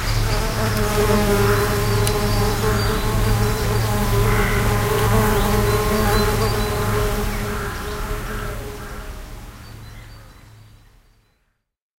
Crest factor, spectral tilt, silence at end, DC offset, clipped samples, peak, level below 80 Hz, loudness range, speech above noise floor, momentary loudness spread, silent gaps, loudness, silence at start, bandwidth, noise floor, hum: 16 dB; -5 dB/octave; 1.3 s; 0.4%; under 0.1%; -4 dBFS; -26 dBFS; 14 LU; 51 dB; 17 LU; none; -20 LUFS; 0 s; 16 kHz; -68 dBFS; none